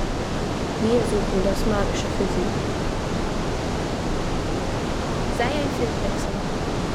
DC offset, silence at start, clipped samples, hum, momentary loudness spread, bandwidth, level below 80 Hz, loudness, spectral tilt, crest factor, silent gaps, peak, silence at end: under 0.1%; 0 s; under 0.1%; none; 5 LU; 14.5 kHz; -30 dBFS; -25 LUFS; -5.5 dB/octave; 14 dB; none; -8 dBFS; 0 s